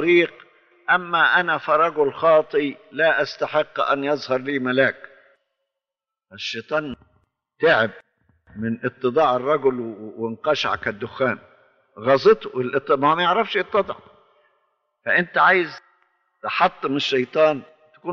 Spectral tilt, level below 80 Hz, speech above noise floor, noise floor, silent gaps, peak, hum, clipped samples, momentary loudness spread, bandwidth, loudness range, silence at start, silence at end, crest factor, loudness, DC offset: -2.5 dB/octave; -64 dBFS; 68 dB; -88 dBFS; none; -4 dBFS; none; under 0.1%; 14 LU; 7 kHz; 6 LU; 0 s; 0 s; 18 dB; -20 LUFS; under 0.1%